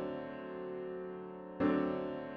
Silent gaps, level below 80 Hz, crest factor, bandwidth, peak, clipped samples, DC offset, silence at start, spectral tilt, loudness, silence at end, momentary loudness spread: none; -70 dBFS; 18 dB; 5.4 kHz; -20 dBFS; under 0.1%; under 0.1%; 0 s; -6 dB/octave; -39 LUFS; 0 s; 12 LU